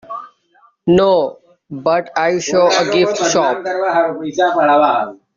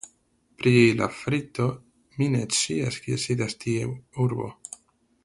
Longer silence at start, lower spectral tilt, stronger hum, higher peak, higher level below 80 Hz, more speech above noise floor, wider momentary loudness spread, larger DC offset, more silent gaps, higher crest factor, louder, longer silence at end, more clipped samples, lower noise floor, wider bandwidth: about the same, 0.1 s vs 0.05 s; about the same, -4 dB/octave vs -5 dB/octave; neither; first, -2 dBFS vs -6 dBFS; first, -52 dBFS vs -58 dBFS; about the same, 40 dB vs 41 dB; second, 11 LU vs 22 LU; neither; neither; second, 14 dB vs 20 dB; first, -15 LUFS vs -25 LUFS; second, 0.2 s vs 0.7 s; neither; second, -54 dBFS vs -65 dBFS; second, 7.6 kHz vs 11.5 kHz